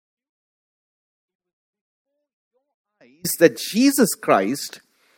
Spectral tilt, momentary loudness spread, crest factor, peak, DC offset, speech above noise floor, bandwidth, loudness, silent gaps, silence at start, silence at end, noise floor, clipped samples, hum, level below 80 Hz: -4 dB/octave; 12 LU; 24 dB; 0 dBFS; under 0.1%; over 71 dB; 17 kHz; -19 LUFS; none; 3.25 s; 0.4 s; under -90 dBFS; under 0.1%; none; -70 dBFS